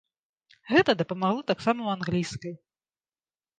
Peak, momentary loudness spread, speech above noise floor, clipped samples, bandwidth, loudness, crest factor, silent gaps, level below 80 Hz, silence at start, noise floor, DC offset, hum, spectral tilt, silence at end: -8 dBFS; 12 LU; over 64 dB; under 0.1%; 9.4 kHz; -26 LUFS; 22 dB; none; -62 dBFS; 0.65 s; under -90 dBFS; under 0.1%; none; -5.5 dB/octave; 1.05 s